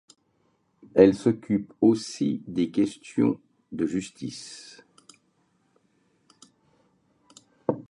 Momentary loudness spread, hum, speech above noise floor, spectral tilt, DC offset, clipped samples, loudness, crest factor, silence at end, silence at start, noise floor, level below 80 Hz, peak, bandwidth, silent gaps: 20 LU; none; 45 dB; -6.5 dB/octave; under 0.1%; under 0.1%; -25 LUFS; 24 dB; 0.1 s; 0.95 s; -69 dBFS; -62 dBFS; -2 dBFS; 11 kHz; none